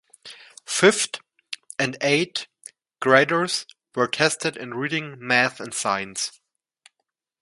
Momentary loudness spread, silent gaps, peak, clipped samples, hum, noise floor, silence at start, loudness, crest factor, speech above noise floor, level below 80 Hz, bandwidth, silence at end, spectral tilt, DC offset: 19 LU; none; 0 dBFS; under 0.1%; none; -80 dBFS; 0.25 s; -22 LUFS; 24 dB; 58 dB; -70 dBFS; 11.5 kHz; 1.1 s; -3 dB/octave; under 0.1%